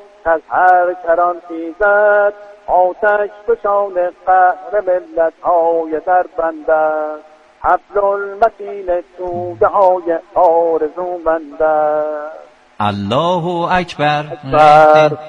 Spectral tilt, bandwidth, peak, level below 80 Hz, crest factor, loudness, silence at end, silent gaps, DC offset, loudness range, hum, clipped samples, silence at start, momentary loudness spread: -6.5 dB/octave; 9 kHz; 0 dBFS; -46 dBFS; 14 dB; -14 LUFS; 0 s; none; under 0.1%; 3 LU; none; under 0.1%; 0.25 s; 10 LU